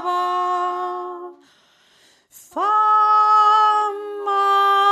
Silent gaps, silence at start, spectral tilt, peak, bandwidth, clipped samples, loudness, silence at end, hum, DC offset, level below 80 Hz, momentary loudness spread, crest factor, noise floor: none; 0 s; -0.5 dB/octave; -6 dBFS; 13 kHz; under 0.1%; -17 LUFS; 0 s; none; under 0.1%; -82 dBFS; 15 LU; 12 dB; -56 dBFS